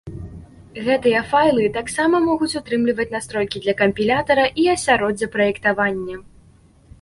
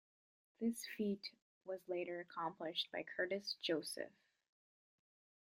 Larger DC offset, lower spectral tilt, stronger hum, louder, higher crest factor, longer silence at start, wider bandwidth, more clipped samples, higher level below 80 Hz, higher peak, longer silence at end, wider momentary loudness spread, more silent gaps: neither; about the same, -4.5 dB/octave vs -4 dB/octave; neither; first, -19 LUFS vs -44 LUFS; about the same, 16 dB vs 20 dB; second, 0.05 s vs 0.6 s; second, 11.5 kHz vs 16 kHz; neither; first, -48 dBFS vs -90 dBFS; first, -4 dBFS vs -26 dBFS; second, 0.8 s vs 1.45 s; first, 12 LU vs 9 LU; second, none vs 1.42-1.61 s